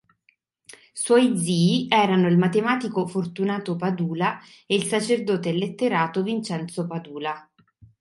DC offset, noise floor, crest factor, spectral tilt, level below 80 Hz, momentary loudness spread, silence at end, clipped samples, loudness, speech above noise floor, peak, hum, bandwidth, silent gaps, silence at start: under 0.1%; -66 dBFS; 20 dB; -5.5 dB/octave; -68 dBFS; 12 LU; 0.6 s; under 0.1%; -23 LUFS; 44 dB; -4 dBFS; none; 11.5 kHz; none; 0.7 s